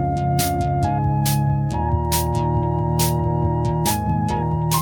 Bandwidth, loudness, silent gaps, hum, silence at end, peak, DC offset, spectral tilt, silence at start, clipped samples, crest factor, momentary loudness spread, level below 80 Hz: 19.5 kHz; -20 LUFS; none; none; 0 s; -4 dBFS; under 0.1%; -6 dB/octave; 0 s; under 0.1%; 16 dB; 2 LU; -32 dBFS